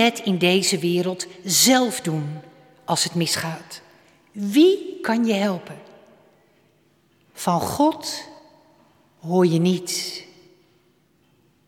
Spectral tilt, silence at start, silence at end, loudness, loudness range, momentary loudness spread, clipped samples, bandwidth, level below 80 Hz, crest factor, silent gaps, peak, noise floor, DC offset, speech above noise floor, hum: -4 dB/octave; 0 s; 1.45 s; -21 LUFS; 6 LU; 21 LU; under 0.1%; 17 kHz; -66 dBFS; 18 dB; none; -4 dBFS; -61 dBFS; under 0.1%; 41 dB; none